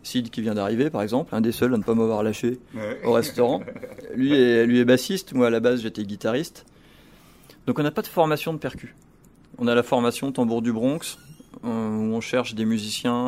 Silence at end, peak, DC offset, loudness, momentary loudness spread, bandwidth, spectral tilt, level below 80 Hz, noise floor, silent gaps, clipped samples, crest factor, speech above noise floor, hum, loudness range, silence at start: 0 s; -6 dBFS; under 0.1%; -23 LUFS; 13 LU; 16 kHz; -5.5 dB/octave; -58 dBFS; -53 dBFS; none; under 0.1%; 18 dB; 30 dB; none; 5 LU; 0.05 s